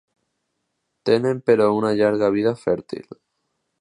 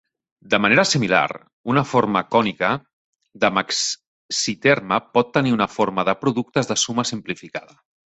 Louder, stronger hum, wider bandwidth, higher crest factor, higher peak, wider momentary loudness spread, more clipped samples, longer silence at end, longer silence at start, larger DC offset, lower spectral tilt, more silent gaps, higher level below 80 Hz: about the same, -20 LUFS vs -20 LUFS; neither; first, 10.5 kHz vs 8.4 kHz; about the same, 18 dB vs 20 dB; about the same, -4 dBFS vs -2 dBFS; about the same, 11 LU vs 11 LU; neither; first, 0.8 s vs 0.5 s; first, 1.05 s vs 0.5 s; neither; first, -7 dB/octave vs -4 dB/octave; second, none vs 1.53-1.64 s, 2.93-3.13 s, 4.07-4.29 s; about the same, -60 dBFS vs -58 dBFS